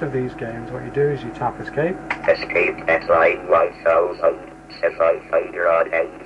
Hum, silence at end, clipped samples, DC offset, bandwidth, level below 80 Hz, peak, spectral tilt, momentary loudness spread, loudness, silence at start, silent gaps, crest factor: none; 0 s; under 0.1%; under 0.1%; 8.8 kHz; -48 dBFS; -6 dBFS; -7 dB/octave; 11 LU; -20 LUFS; 0 s; none; 14 dB